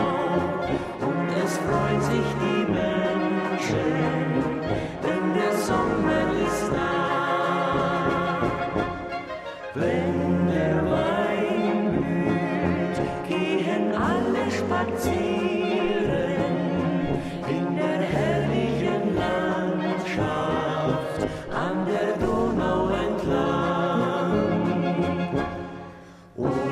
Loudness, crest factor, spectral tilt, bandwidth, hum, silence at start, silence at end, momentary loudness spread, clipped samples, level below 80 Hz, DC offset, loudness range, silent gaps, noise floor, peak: -25 LUFS; 14 dB; -6.5 dB/octave; 14 kHz; none; 0 s; 0 s; 5 LU; under 0.1%; -46 dBFS; under 0.1%; 2 LU; none; -45 dBFS; -10 dBFS